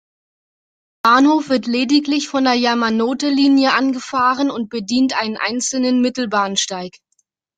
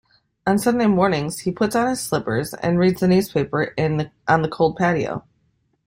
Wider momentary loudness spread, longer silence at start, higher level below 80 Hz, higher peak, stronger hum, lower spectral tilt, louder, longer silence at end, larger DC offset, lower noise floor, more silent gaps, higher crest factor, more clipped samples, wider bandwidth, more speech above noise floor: about the same, 7 LU vs 7 LU; first, 1.05 s vs 0.45 s; second, -62 dBFS vs -52 dBFS; about the same, -2 dBFS vs -2 dBFS; neither; second, -3 dB/octave vs -6 dB/octave; first, -16 LUFS vs -20 LUFS; about the same, 0.7 s vs 0.7 s; neither; about the same, -67 dBFS vs -66 dBFS; neither; about the same, 16 dB vs 18 dB; neither; second, 9.4 kHz vs 16 kHz; first, 50 dB vs 46 dB